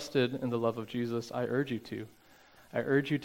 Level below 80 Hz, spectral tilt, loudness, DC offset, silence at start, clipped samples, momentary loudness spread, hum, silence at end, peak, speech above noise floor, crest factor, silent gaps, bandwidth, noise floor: -70 dBFS; -6.5 dB/octave; -33 LUFS; under 0.1%; 0 s; under 0.1%; 11 LU; none; 0 s; -16 dBFS; 27 dB; 18 dB; none; 17 kHz; -59 dBFS